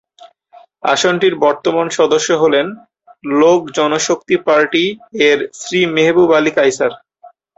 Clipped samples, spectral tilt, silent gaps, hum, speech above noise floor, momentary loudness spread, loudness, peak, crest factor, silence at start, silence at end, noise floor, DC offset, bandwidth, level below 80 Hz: under 0.1%; -3.5 dB/octave; none; none; 32 dB; 7 LU; -14 LUFS; -2 dBFS; 14 dB; 0.85 s; 0.3 s; -45 dBFS; under 0.1%; 8.2 kHz; -58 dBFS